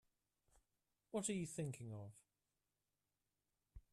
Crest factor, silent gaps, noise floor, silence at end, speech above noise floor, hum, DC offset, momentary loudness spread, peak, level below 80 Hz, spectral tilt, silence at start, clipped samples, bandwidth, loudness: 22 dB; none; under -90 dBFS; 0.15 s; over 44 dB; none; under 0.1%; 12 LU; -30 dBFS; -74 dBFS; -5 dB/octave; 1.15 s; under 0.1%; 13.5 kHz; -47 LUFS